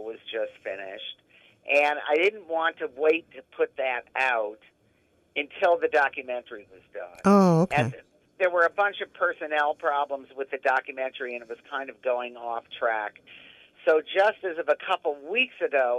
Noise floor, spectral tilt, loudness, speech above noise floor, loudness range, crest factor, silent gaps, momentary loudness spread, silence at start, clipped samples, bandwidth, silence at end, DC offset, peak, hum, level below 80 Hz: -66 dBFS; -6 dB/octave; -26 LUFS; 40 dB; 6 LU; 18 dB; none; 13 LU; 0 s; under 0.1%; 12.5 kHz; 0 s; under 0.1%; -8 dBFS; none; -70 dBFS